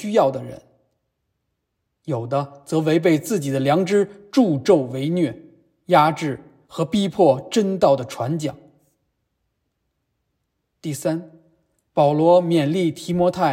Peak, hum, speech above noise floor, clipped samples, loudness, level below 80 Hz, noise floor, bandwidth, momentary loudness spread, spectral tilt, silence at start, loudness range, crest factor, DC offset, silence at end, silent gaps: -4 dBFS; none; 57 dB; under 0.1%; -20 LUFS; -62 dBFS; -76 dBFS; 16 kHz; 12 LU; -6.5 dB/octave; 0 s; 10 LU; 18 dB; under 0.1%; 0 s; none